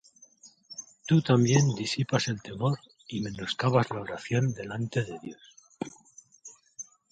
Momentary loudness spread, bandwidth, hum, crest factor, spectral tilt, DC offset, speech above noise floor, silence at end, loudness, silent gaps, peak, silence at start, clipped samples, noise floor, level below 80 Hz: 21 LU; 9 kHz; none; 22 dB; -5.5 dB/octave; under 0.1%; 30 dB; 0.3 s; -28 LUFS; none; -8 dBFS; 0.45 s; under 0.1%; -57 dBFS; -62 dBFS